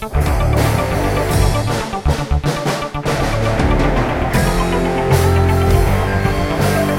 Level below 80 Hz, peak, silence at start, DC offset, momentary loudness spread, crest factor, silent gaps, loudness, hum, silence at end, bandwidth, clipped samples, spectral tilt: -22 dBFS; 0 dBFS; 0 s; under 0.1%; 5 LU; 14 dB; none; -16 LUFS; none; 0 s; 16.5 kHz; under 0.1%; -6 dB/octave